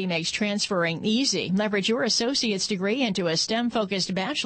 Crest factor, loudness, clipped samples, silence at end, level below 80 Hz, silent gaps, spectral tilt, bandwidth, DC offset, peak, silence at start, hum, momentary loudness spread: 12 dB; -24 LUFS; under 0.1%; 0 s; -62 dBFS; none; -3.5 dB/octave; 8.8 kHz; under 0.1%; -12 dBFS; 0 s; none; 3 LU